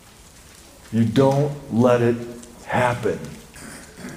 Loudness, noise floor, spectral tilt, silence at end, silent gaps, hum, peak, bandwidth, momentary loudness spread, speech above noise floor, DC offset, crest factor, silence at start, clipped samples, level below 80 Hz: -21 LUFS; -46 dBFS; -7 dB/octave; 0 s; none; none; -4 dBFS; 15.5 kHz; 21 LU; 27 dB; under 0.1%; 18 dB; 0.9 s; under 0.1%; -52 dBFS